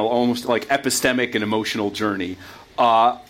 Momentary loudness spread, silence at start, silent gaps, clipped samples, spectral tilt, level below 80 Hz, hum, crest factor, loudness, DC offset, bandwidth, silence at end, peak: 11 LU; 0 s; none; under 0.1%; -3.5 dB/octave; -58 dBFS; none; 16 dB; -20 LUFS; under 0.1%; 16.5 kHz; 0.05 s; -4 dBFS